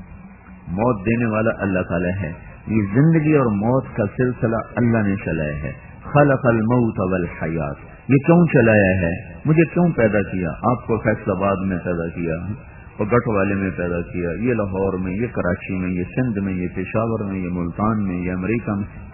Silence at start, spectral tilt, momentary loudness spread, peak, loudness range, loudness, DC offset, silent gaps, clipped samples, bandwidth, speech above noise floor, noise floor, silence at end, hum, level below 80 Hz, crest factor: 0 s; -13 dB/octave; 10 LU; -2 dBFS; 5 LU; -20 LUFS; under 0.1%; none; under 0.1%; 3 kHz; 22 dB; -41 dBFS; 0 s; none; -42 dBFS; 18 dB